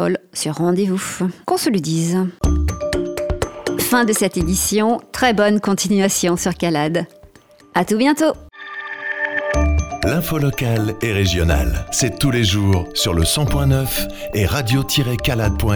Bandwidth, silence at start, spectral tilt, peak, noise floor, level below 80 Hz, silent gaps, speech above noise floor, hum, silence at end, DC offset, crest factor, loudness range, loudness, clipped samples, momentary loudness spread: over 20 kHz; 0 s; -4.5 dB/octave; -2 dBFS; -47 dBFS; -28 dBFS; none; 29 dB; none; 0 s; under 0.1%; 16 dB; 3 LU; -18 LUFS; under 0.1%; 7 LU